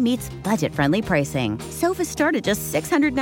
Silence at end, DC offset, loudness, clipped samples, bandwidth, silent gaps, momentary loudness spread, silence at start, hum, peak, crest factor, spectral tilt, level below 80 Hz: 0 s; under 0.1%; -22 LUFS; under 0.1%; 17 kHz; none; 5 LU; 0 s; none; -6 dBFS; 16 dB; -5 dB/octave; -46 dBFS